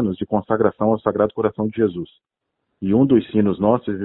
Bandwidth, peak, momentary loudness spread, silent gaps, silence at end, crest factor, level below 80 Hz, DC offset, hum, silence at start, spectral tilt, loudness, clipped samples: 4.1 kHz; -2 dBFS; 7 LU; none; 0 s; 18 dB; -52 dBFS; under 0.1%; none; 0 s; -13 dB/octave; -19 LUFS; under 0.1%